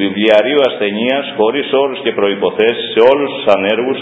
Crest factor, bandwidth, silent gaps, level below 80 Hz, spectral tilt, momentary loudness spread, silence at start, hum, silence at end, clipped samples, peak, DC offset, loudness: 12 dB; 8 kHz; none; -58 dBFS; -6.5 dB/octave; 5 LU; 0 s; none; 0 s; 0.2%; 0 dBFS; under 0.1%; -13 LUFS